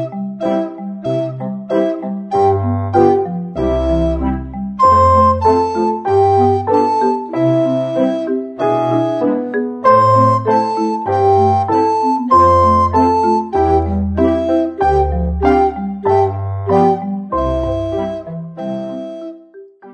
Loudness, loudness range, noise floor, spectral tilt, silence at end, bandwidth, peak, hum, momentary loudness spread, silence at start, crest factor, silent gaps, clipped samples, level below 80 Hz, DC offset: -14 LUFS; 4 LU; -39 dBFS; -8.5 dB/octave; 0 s; 8.8 kHz; 0 dBFS; none; 12 LU; 0 s; 14 dB; none; under 0.1%; -30 dBFS; under 0.1%